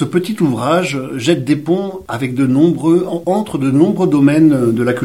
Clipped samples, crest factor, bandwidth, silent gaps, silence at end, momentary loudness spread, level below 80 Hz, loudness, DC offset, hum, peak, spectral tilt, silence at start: under 0.1%; 14 dB; 15.5 kHz; none; 0 s; 7 LU; -52 dBFS; -14 LUFS; 0.3%; none; 0 dBFS; -7 dB/octave; 0 s